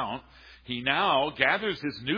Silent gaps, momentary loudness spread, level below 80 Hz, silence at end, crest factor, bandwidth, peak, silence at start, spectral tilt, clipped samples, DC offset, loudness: none; 12 LU; -58 dBFS; 0 s; 22 dB; 5.2 kHz; -8 dBFS; 0 s; -6 dB/octave; under 0.1%; under 0.1%; -26 LUFS